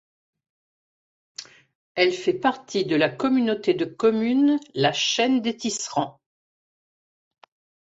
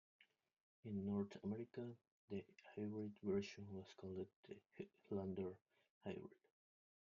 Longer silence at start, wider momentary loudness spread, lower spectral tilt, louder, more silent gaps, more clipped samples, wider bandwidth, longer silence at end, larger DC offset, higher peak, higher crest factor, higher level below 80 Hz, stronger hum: first, 1.4 s vs 0.2 s; about the same, 13 LU vs 14 LU; second, -4 dB/octave vs -7.5 dB/octave; first, -23 LUFS vs -50 LUFS; second, 1.75-1.95 s vs 0.61-0.83 s, 2.07-2.28 s, 4.36-4.43 s, 5.90-6.01 s; neither; first, 8 kHz vs 7.2 kHz; first, 1.7 s vs 0.85 s; neither; first, -6 dBFS vs -32 dBFS; about the same, 20 dB vs 18 dB; first, -68 dBFS vs -84 dBFS; neither